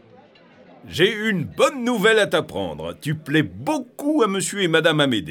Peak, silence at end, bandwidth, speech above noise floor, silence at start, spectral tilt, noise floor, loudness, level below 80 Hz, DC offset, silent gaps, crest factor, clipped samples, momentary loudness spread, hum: -4 dBFS; 0 s; 18.5 kHz; 29 dB; 0.85 s; -4.5 dB/octave; -50 dBFS; -20 LUFS; -58 dBFS; under 0.1%; none; 18 dB; under 0.1%; 11 LU; none